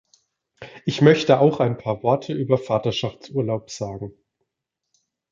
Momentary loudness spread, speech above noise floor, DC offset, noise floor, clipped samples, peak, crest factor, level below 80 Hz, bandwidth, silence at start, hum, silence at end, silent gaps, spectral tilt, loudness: 15 LU; 62 dB; under 0.1%; -82 dBFS; under 0.1%; -2 dBFS; 20 dB; -58 dBFS; 7.6 kHz; 0.6 s; none; 1.2 s; none; -6.5 dB/octave; -21 LUFS